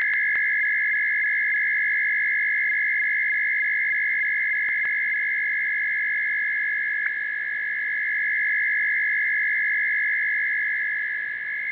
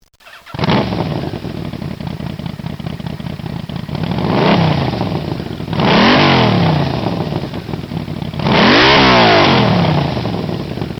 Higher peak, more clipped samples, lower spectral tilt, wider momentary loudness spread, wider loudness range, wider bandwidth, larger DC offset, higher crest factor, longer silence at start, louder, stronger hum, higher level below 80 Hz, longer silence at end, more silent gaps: second, -12 dBFS vs 0 dBFS; neither; second, 2 dB/octave vs -6.5 dB/octave; second, 4 LU vs 17 LU; second, 2 LU vs 10 LU; second, 4 kHz vs 16 kHz; neither; about the same, 12 dB vs 14 dB; second, 0 s vs 0.25 s; second, -21 LUFS vs -13 LUFS; neither; second, -70 dBFS vs -36 dBFS; about the same, 0 s vs 0 s; neither